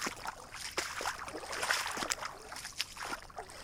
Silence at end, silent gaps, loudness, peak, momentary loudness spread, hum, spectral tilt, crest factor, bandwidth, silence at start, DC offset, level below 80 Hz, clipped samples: 0 s; none; -38 LUFS; -8 dBFS; 11 LU; none; -0.5 dB/octave; 32 dB; 18 kHz; 0 s; under 0.1%; -60 dBFS; under 0.1%